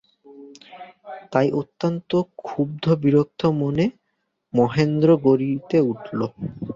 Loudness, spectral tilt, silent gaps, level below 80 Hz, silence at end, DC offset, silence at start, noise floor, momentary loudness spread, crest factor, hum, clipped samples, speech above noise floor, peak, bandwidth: -21 LUFS; -8.5 dB/octave; none; -58 dBFS; 0 s; under 0.1%; 0.3 s; -74 dBFS; 14 LU; 18 dB; none; under 0.1%; 54 dB; -4 dBFS; 7.4 kHz